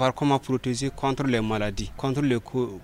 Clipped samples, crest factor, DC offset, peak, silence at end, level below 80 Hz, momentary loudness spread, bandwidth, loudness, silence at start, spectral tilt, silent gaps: under 0.1%; 16 dB; under 0.1%; -8 dBFS; 0 s; -44 dBFS; 5 LU; 15.5 kHz; -26 LUFS; 0 s; -6 dB/octave; none